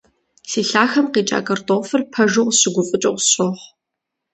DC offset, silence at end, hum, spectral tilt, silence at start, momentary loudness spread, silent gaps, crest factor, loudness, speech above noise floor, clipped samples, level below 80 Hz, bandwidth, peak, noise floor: under 0.1%; 0.7 s; none; -3 dB/octave; 0.45 s; 7 LU; none; 18 dB; -17 LUFS; 63 dB; under 0.1%; -64 dBFS; 9 kHz; 0 dBFS; -80 dBFS